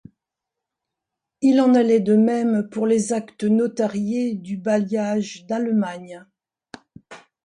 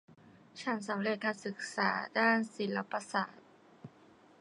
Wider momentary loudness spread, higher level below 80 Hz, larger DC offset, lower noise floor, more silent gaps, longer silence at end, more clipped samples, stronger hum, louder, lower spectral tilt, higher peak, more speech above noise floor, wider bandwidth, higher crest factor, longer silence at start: about the same, 10 LU vs 12 LU; first, -68 dBFS vs -84 dBFS; neither; first, -85 dBFS vs -61 dBFS; neither; second, 0.25 s vs 0.5 s; neither; neither; first, -20 LUFS vs -34 LUFS; first, -6.5 dB/octave vs -4.5 dB/octave; first, -6 dBFS vs -14 dBFS; first, 65 dB vs 27 dB; about the same, 10.5 kHz vs 11 kHz; second, 14 dB vs 22 dB; first, 1.4 s vs 0.1 s